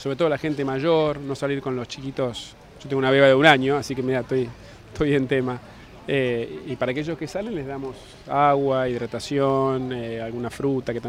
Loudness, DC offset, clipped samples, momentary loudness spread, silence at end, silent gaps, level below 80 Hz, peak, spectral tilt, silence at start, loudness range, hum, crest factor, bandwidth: -23 LUFS; under 0.1%; under 0.1%; 15 LU; 0 s; none; -50 dBFS; 0 dBFS; -6 dB/octave; 0 s; 5 LU; none; 22 dB; 13 kHz